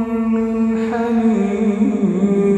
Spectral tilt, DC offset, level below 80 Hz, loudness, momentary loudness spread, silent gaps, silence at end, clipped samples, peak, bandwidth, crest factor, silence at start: -8.5 dB/octave; under 0.1%; -48 dBFS; -17 LUFS; 2 LU; none; 0 s; under 0.1%; -4 dBFS; 8.6 kHz; 12 dB; 0 s